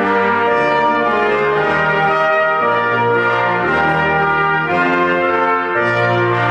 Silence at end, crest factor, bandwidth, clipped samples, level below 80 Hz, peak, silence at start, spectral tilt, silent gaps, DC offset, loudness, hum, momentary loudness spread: 0 s; 10 dB; 9.4 kHz; under 0.1%; -46 dBFS; -4 dBFS; 0 s; -6.5 dB/octave; none; under 0.1%; -14 LUFS; none; 1 LU